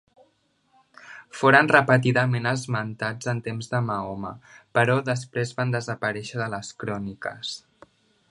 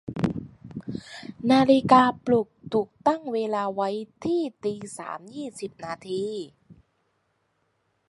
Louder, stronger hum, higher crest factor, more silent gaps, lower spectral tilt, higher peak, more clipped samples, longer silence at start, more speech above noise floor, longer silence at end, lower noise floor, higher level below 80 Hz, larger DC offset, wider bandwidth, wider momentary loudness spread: about the same, -24 LUFS vs -25 LUFS; neither; about the same, 24 dB vs 24 dB; neither; about the same, -5.5 dB/octave vs -6 dB/octave; about the same, 0 dBFS vs -2 dBFS; neither; first, 1.05 s vs 0.05 s; second, 43 dB vs 48 dB; second, 0.75 s vs 1.35 s; second, -67 dBFS vs -72 dBFS; about the same, -62 dBFS vs -60 dBFS; neither; about the same, 11.5 kHz vs 11.5 kHz; second, 16 LU vs 19 LU